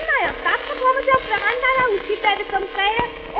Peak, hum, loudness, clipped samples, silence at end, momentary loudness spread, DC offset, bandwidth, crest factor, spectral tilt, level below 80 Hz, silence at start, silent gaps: -2 dBFS; none; -19 LUFS; under 0.1%; 0 s; 4 LU; under 0.1%; 5.8 kHz; 18 dB; -6 dB/octave; -44 dBFS; 0 s; none